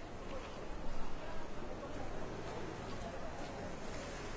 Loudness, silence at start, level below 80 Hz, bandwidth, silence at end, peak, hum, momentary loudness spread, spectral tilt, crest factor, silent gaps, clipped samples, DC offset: -46 LUFS; 0 s; -50 dBFS; 8 kHz; 0 s; -26 dBFS; none; 2 LU; -5 dB/octave; 16 dB; none; under 0.1%; under 0.1%